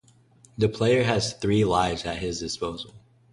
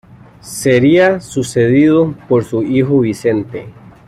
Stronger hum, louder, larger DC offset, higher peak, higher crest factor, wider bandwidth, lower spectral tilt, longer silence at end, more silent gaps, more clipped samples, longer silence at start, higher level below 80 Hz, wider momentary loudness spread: neither; second, -25 LUFS vs -13 LUFS; neither; second, -8 dBFS vs -2 dBFS; first, 18 dB vs 12 dB; second, 11.5 kHz vs 14 kHz; second, -5 dB/octave vs -6.5 dB/octave; about the same, 0.35 s vs 0.35 s; neither; neither; first, 0.6 s vs 0.45 s; about the same, -48 dBFS vs -48 dBFS; first, 13 LU vs 10 LU